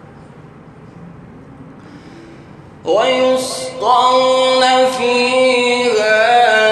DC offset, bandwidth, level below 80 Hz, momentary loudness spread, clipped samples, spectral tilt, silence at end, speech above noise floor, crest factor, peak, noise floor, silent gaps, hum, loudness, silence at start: under 0.1%; 12 kHz; -54 dBFS; 8 LU; under 0.1%; -2.5 dB/octave; 0 s; 25 dB; 14 dB; 0 dBFS; -38 dBFS; none; none; -12 LUFS; 0.2 s